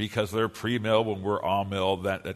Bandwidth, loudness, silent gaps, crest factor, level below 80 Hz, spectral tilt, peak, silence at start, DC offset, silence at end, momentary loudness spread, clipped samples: 13.5 kHz; -27 LUFS; none; 18 dB; -60 dBFS; -6 dB/octave; -10 dBFS; 0 s; under 0.1%; 0 s; 4 LU; under 0.1%